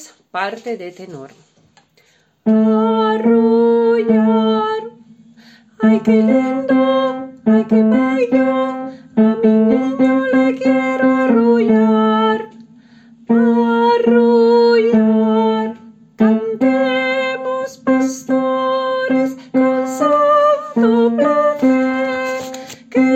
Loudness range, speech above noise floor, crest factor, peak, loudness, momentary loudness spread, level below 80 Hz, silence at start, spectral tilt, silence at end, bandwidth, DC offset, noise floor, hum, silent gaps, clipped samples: 3 LU; 42 dB; 12 dB; -2 dBFS; -14 LUFS; 10 LU; -58 dBFS; 0 s; -6.5 dB/octave; 0 s; 8.2 kHz; under 0.1%; -56 dBFS; none; none; under 0.1%